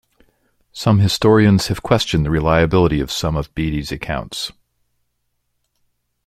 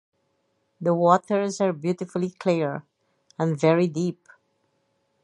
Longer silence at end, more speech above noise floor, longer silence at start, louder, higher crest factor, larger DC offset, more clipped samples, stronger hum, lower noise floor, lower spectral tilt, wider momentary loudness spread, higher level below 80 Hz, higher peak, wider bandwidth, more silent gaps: first, 1.75 s vs 1.1 s; first, 54 dB vs 49 dB; about the same, 0.75 s vs 0.8 s; first, -17 LUFS vs -24 LUFS; about the same, 18 dB vs 22 dB; neither; neither; neither; about the same, -70 dBFS vs -71 dBFS; about the same, -6 dB/octave vs -7 dB/octave; about the same, 12 LU vs 10 LU; first, -36 dBFS vs -74 dBFS; first, 0 dBFS vs -4 dBFS; first, 15 kHz vs 11 kHz; neither